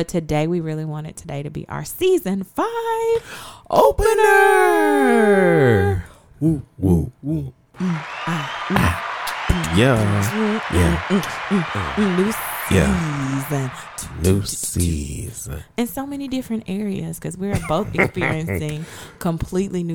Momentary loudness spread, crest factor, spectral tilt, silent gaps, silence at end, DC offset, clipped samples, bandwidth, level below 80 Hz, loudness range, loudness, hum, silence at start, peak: 14 LU; 18 dB; -5.5 dB/octave; none; 0 s; 0.2%; under 0.1%; over 20 kHz; -38 dBFS; 8 LU; -20 LUFS; none; 0 s; -2 dBFS